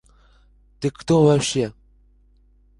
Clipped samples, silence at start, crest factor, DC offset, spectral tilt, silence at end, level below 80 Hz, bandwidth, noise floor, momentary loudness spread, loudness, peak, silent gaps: under 0.1%; 0.8 s; 18 dB; under 0.1%; -5.5 dB/octave; 1.1 s; -50 dBFS; 11.5 kHz; -56 dBFS; 12 LU; -20 LUFS; -6 dBFS; none